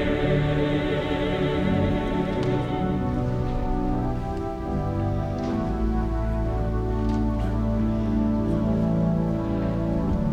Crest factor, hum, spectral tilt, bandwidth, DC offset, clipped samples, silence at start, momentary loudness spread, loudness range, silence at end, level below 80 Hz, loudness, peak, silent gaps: 14 dB; none; -8.5 dB/octave; 8.6 kHz; under 0.1%; under 0.1%; 0 s; 4 LU; 2 LU; 0 s; -30 dBFS; -25 LUFS; -10 dBFS; none